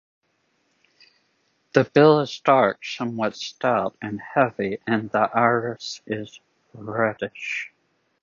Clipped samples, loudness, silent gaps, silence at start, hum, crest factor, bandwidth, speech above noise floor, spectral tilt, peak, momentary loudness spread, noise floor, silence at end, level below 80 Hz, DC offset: under 0.1%; -22 LUFS; none; 1.75 s; none; 24 dB; 7.4 kHz; 47 dB; -6 dB/octave; 0 dBFS; 15 LU; -69 dBFS; 0.55 s; -66 dBFS; under 0.1%